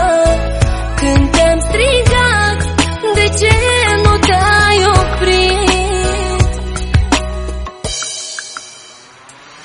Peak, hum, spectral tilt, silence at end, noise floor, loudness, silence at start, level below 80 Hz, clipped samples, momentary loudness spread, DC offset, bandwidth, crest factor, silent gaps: 0 dBFS; none; -4 dB/octave; 0 s; -39 dBFS; -12 LUFS; 0 s; -20 dBFS; under 0.1%; 12 LU; under 0.1%; 11 kHz; 12 dB; none